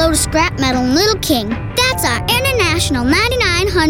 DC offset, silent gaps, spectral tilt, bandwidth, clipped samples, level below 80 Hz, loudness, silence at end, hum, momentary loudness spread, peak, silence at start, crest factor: under 0.1%; none; -3.5 dB/octave; 17.5 kHz; under 0.1%; -28 dBFS; -14 LUFS; 0 s; none; 3 LU; -2 dBFS; 0 s; 12 dB